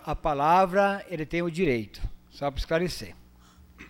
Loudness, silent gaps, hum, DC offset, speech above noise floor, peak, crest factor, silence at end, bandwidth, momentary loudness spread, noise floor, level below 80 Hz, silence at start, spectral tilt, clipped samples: -26 LUFS; none; 60 Hz at -50 dBFS; under 0.1%; 28 dB; -10 dBFS; 18 dB; 0 s; 16 kHz; 18 LU; -54 dBFS; -42 dBFS; 0 s; -6 dB/octave; under 0.1%